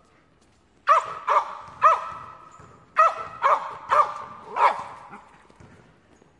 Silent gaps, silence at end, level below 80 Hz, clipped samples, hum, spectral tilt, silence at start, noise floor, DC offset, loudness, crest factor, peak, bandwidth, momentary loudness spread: none; 1.2 s; -66 dBFS; under 0.1%; none; -3 dB/octave; 0.85 s; -60 dBFS; under 0.1%; -22 LUFS; 20 dB; -6 dBFS; 11 kHz; 18 LU